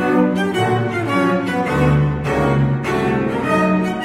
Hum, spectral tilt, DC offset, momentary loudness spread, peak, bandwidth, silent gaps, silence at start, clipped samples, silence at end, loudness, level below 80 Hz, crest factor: none; -7.5 dB/octave; under 0.1%; 3 LU; -4 dBFS; 13 kHz; none; 0 s; under 0.1%; 0 s; -17 LUFS; -36 dBFS; 14 dB